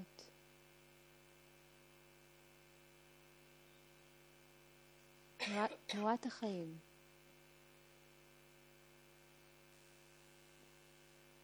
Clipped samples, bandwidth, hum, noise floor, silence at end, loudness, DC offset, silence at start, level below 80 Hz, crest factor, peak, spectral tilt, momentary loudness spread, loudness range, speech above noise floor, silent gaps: under 0.1%; over 20 kHz; none; -66 dBFS; 0 s; -43 LUFS; under 0.1%; 0 s; -80 dBFS; 28 dB; -24 dBFS; -4.5 dB/octave; 23 LU; 20 LU; 24 dB; none